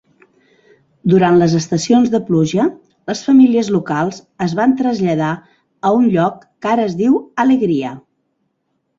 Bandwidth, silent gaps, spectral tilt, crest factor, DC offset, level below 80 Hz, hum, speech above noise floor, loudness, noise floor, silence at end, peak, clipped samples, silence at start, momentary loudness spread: 7.8 kHz; none; -6.5 dB/octave; 14 dB; under 0.1%; -56 dBFS; none; 55 dB; -15 LUFS; -68 dBFS; 1 s; -2 dBFS; under 0.1%; 1.05 s; 11 LU